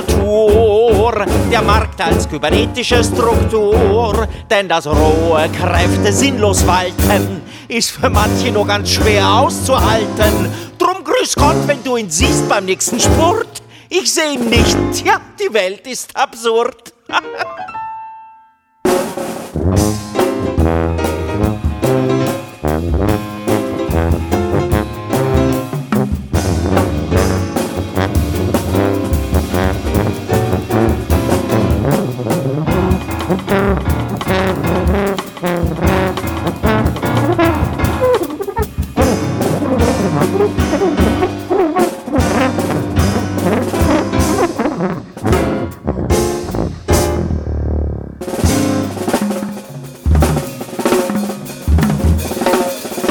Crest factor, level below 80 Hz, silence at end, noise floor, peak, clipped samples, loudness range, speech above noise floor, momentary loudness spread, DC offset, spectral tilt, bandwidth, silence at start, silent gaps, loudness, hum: 14 dB; -24 dBFS; 0 s; -48 dBFS; 0 dBFS; under 0.1%; 4 LU; 35 dB; 8 LU; under 0.1%; -5 dB/octave; over 20 kHz; 0 s; none; -15 LUFS; none